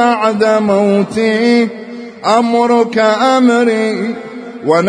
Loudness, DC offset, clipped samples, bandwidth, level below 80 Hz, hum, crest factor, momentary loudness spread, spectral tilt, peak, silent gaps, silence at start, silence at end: -12 LUFS; under 0.1%; under 0.1%; 10.5 kHz; -58 dBFS; none; 12 dB; 11 LU; -5.5 dB/octave; 0 dBFS; none; 0 s; 0 s